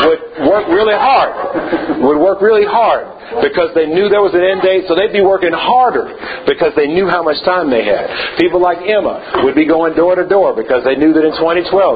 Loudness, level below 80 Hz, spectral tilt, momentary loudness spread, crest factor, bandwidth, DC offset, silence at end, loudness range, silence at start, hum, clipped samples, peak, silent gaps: -12 LUFS; -44 dBFS; -8 dB/octave; 6 LU; 12 dB; 5 kHz; under 0.1%; 0 s; 1 LU; 0 s; none; under 0.1%; 0 dBFS; none